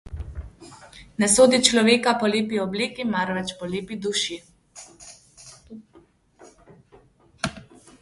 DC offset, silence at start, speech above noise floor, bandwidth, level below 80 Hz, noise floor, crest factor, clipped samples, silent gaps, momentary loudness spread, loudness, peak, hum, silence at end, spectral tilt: under 0.1%; 0.05 s; 35 dB; 11.5 kHz; -48 dBFS; -56 dBFS; 24 dB; under 0.1%; none; 28 LU; -21 LUFS; -2 dBFS; none; 0.4 s; -3 dB/octave